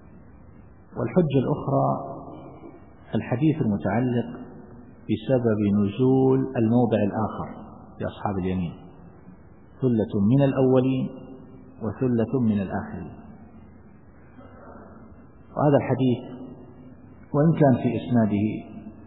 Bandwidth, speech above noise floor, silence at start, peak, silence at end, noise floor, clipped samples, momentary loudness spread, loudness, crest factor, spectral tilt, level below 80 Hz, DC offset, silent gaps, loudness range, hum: 4 kHz; 28 dB; 0.9 s; -6 dBFS; 0 s; -50 dBFS; under 0.1%; 22 LU; -24 LUFS; 18 dB; -13 dB/octave; -54 dBFS; 0.2%; none; 6 LU; none